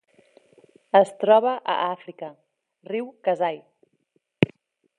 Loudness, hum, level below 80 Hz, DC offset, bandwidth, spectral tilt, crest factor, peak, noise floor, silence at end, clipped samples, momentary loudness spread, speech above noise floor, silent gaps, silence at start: -23 LUFS; none; -68 dBFS; under 0.1%; 11 kHz; -6.5 dB/octave; 24 dB; -2 dBFS; -70 dBFS; 0.55 s; under 0.1%; 20 LU; 48 dB; none; 0.95 s